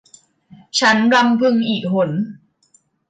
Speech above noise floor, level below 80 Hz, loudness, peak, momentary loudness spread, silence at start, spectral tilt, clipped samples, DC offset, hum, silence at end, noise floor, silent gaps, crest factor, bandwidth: 43 dB; -64 dBFS; -16 LUFS; -4 dBFS; 9 LU; 0.75 s; -4.5 dB/octave; under 0.1%; under 0.1%; none; 0.75 s; -58 dBFS; none; 14 dB; 9.2 kHz